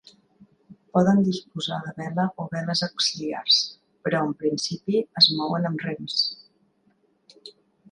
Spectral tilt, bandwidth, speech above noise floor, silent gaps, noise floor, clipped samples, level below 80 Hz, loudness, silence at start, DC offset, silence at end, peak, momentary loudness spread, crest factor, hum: -4.5 dB/octave; 11 kHz; 41 dB; none; -65 dBFS; under 0.1%; -68 dBFS; -23 LUFS; 0.4 s; under 0.1%; 0.4 s; -4 dBFS; 13 LU; 22 dB; none